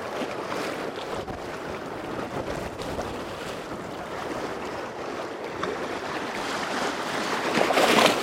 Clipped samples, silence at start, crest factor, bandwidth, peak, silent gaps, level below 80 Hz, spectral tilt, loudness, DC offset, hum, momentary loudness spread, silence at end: under 0.1%; 0 s; 24 dB; 16.5 kHz; -4 dBFS; none; -54 dBFS; -3.5 dB/octave; -28 LUFS; under 0.1%; none; 12 LU; 0 s